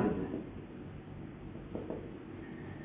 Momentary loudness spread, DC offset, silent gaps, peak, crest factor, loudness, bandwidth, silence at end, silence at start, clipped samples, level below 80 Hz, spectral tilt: 9 LU; under 0.1%; none; -20 dBFS; 20 dB; -43 LUFS; 4 kHz; 0 s; 0 s; under 0.1%; -56 dBFS; -8 dB/octave